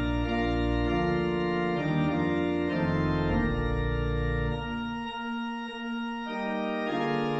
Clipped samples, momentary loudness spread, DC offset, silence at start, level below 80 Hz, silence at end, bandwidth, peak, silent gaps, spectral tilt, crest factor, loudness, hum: under 0.1%; 7 LU; under 0.1%; 0 s; -38 dBFS; 0 s; 8 kHz; -14 dBFS; none; -8 dB/octave; 14 dB; -29 LUFS; none